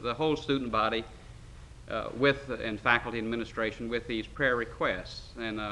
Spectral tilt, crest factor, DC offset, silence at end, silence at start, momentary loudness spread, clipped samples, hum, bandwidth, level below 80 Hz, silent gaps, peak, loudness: -5.5 dB/octave; 24 dB; under 0.1%; 0 s; 0 s; 18 LU; under 0.1%; none; 11.5 kHz; -50 dBFS; none; -8 dBFS; -30 LUFS